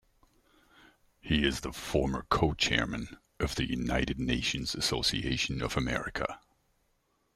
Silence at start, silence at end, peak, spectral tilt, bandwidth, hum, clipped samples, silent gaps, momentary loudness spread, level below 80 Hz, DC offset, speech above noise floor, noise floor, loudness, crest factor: 1.25 s; 1 s; -10 dBFS; -4 dB/octave; 15.5 kHz; none; under 0.1%; none; 9 LU; -44 dBFS; under 0.1%; 43 dB; -74 dBFS; -31 LUFS; 22 dB